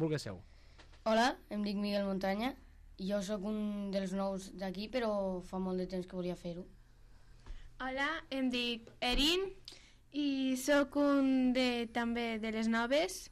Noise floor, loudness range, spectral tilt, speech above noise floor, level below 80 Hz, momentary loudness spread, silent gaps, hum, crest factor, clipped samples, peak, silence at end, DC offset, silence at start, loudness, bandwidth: -58 dBFS; 7 LU; -4.5 dB/octave; 23 dB; -54 dBFS; 12 LU; none; none; 16 dB; under 0.1%; -20 dBFS; 0 s; under 0.1%; 0 s; -35 LUFS; 14 kHz